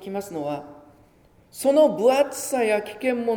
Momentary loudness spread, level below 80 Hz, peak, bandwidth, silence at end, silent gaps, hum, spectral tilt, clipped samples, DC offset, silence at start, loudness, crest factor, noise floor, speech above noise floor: 13 LU; -64 dBFS; -6 dBFS; over 20 kHz; 0 s; none; none; -4 dB/octave; under 0.1%; under 0.1%; 0 s; -22 LUFS; 18 dB; -56 dBFS; 34 dB